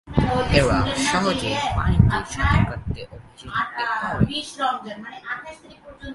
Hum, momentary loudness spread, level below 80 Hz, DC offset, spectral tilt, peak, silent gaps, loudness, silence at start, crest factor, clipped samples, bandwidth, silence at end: none; 16 LU; -32 dBFS; under 0.1%; -5.5 dB/octave; 0 dBFS; none; -22 LUFS; 0.05 s; 22 dB; under 0.1%; 11.5 kHz; 0 s